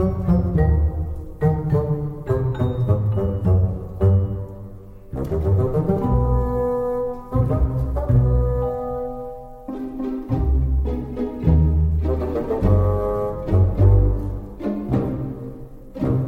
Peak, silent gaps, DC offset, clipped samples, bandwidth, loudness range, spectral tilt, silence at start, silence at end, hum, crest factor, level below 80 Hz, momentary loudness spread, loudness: -4 dBFS; none; under 0.1%; under 0.1%; 3.9 kHz; 3 LU; -11 dB/octave; 0 s; 0 s; none; 16 dB; -26 dBFS; 12 LU; -21 LUFS